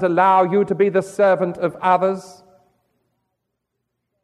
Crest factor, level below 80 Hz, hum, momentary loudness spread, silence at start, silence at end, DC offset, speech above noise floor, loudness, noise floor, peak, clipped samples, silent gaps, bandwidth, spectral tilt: 16 dB; -66 dBFS; none; 8 LU; 0 s; 1.95 s; under 0.1%; 60 dB; -17 LUFS; -77 dBFS; -4 dBFS; under 0.1%; none; 12 kHz; -7 dB/octave